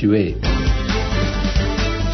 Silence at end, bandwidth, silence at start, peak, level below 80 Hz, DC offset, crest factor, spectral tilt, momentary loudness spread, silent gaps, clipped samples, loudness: 0 s; 6.4 kHz; 0 s; -4 dBFS; -22 dBFS; under 0.1%; 14 dB; -6 dB/octave; 2 LU; none; under 0.1%; -20 LUFS